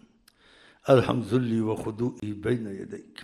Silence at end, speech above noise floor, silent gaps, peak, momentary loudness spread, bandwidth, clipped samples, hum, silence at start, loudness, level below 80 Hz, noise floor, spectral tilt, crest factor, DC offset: 0 s; 34 dB; none; -6 dBFS; 16 LU; 13 kHz; under 0.1%; none; 0.85 s; -26 LUFS; -58 dBFS; -60 dBFS; -7.5 dB/octave; 20 dB; under 0.1%